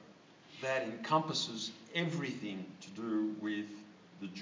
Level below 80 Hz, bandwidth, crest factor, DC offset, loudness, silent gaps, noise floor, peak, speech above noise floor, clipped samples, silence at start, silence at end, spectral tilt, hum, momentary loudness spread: -86 dBFS; 7.6 kHz; 20 dB; under 0.1%; -37 LUFS; none; -59 dBFS; -18 dBFS; 22 dB; under 0.1%; 0 s; 0 s; -4.5 dB/octave; none; 15 LU